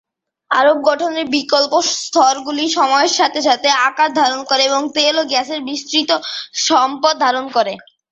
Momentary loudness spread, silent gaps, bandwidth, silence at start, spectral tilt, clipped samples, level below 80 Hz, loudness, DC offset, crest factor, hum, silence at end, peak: 6 LU; none; 8.2 kHz; 0.5 s; -0.5 dB/octave; under 0.1%; -66 dBFS; -15 LUFS; under 0.1%; 14 dB; none; 0.35 s; 0 dBFS